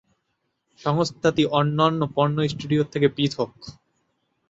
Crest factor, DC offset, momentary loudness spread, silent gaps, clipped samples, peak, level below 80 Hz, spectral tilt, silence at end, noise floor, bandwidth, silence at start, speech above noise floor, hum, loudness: 18 dB; under 0.1%; 10 LU; none; under 0.1%; -6 dBFS; -58 dBFS; -6.5 dB/octave; 0.8 s; -75 dBFS; 8 kHz; 0.85 s; 53 dB; none; -23 LUFS